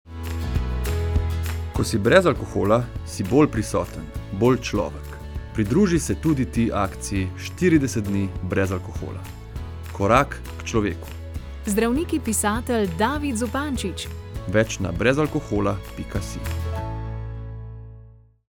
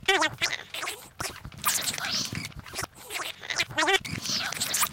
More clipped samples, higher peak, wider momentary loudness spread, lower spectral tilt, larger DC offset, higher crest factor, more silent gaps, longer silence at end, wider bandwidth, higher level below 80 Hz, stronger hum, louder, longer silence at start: neither; first, 0 dBFS vs -10 dBFS; first, 15 LU vs 12 LU; first, -5.5 dB/octave vs -1 dB/octave; neither; about the same, 24 dB vs 20 dB; neither; first, 0.4 s vs 0 s; first, 20 kHz vs 17 kHz; first, -36 dBFS vs -56 dBFS; neither; first, -23 LUFS vs -28 LUFS; about the same, 0.05 s vs 0 s